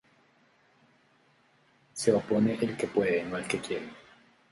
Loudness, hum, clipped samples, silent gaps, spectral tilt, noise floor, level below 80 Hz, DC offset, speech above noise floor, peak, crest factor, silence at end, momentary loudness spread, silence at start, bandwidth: -29 LUFS; none; under 0.1%; none; -5 dB/octave; -65 dBFS; -66 dBFS; under 0.1%; 37 dB; -10 dBFS; 22 dB; 0.5 s; 11 LU; 1.95 s; 11.5 kHz